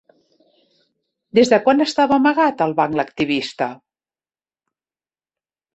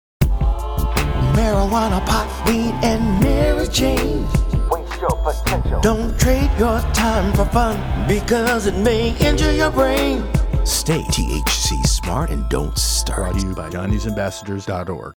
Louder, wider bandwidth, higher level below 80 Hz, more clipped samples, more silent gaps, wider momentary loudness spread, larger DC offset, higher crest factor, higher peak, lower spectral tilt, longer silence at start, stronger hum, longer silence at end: about the same, -17 LUFS vs -19 LUFS; second, 8.4 kHz vs over 20 kHz; second, -62 dBFS vs -22 dBFS; neither; neither; first, 8 LU vs 5 LU; neither; about the same, 18 dB vs 16 dB; about the same, -2 dBFS vs -2 dBFS; about the same, -5 dB/octave vs -5 dB/octave; first, 1.35 s vs 0.2 s; neither; first, 2 s vs 0.05 s